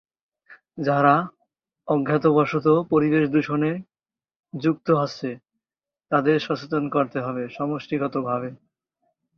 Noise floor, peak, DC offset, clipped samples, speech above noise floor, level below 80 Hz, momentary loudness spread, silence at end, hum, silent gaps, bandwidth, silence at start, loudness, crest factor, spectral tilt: under -90 dBFS; -4 dBFS; under 0.1%; under 0.1%; over 68 dB; -66 dBFS; 14 LU; 0.85 s; none; 4.36-4.43 s; 6.6 kHz; 0.5 s; -23 LUFS; 18 dB; -8 dB/octave